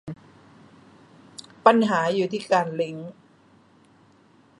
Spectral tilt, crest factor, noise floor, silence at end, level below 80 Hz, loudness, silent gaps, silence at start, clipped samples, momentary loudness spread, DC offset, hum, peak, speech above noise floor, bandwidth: -5.5 dB/octave; 26 dB; -57 dBFS; 1.5 s; -70 dBFS; -22 LUFS; none; 0.05 s; under 0.1%; 25 LU; under 0.1%; none; 0 dBFS; 35 dB; 11.5 kHz